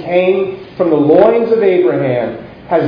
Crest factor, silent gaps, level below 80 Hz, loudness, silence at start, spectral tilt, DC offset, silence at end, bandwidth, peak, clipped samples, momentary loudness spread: 12 dB; none; -50 dBFS; -12 LUFS; 0 s; -10 dB/octave; under 0.1%; 0 s; 5.2 kHz; 0 dBFS; 0.2%; 11 LU